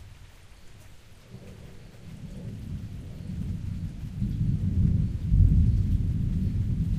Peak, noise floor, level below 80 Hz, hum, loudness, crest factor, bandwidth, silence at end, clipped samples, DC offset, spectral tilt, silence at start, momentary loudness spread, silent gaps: -8 dBFS; -48 dBFS; -32 dBFS; none; -28 LUFS; 18 dB; 8.8 kHz; 0 s; under 0.1%; under 0.1%; -9 dB/octave; 0 s; 23 LU; none